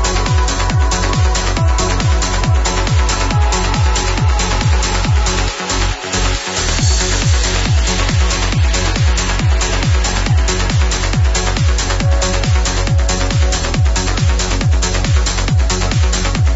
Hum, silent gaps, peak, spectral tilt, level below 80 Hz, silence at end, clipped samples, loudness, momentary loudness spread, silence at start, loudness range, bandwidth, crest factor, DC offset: none; none; -2 dBFS; -4 dB/octave; -16 dBFS; 0 s; under 0.1%; -15 LUFS; 1 LU; 0 s; 1 LU; 8 kHz; 12 dB; under 0.1%